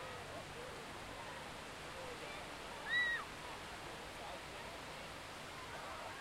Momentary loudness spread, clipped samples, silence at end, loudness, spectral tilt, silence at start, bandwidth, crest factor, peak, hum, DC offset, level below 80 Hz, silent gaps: 11 LU; under 0.1%; 0 s; -45 LUFS; -2.5 dB/octave; 0 s; 16 kHz; 20 dB; -26 dBFS; none; under 0.1%; -64 dBFS; none